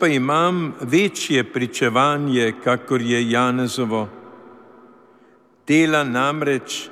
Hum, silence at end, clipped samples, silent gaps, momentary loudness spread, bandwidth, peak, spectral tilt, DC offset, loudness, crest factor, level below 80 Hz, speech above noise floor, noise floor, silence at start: none; 0 s; under 0.1%; none; 7 LU; 15 kHz; -4 dBFS; -5 dB/octave; under 0.1%; -19 LUFS; 16 dB; -70 dBFS; 34 dB; -53 dBFS; 0 s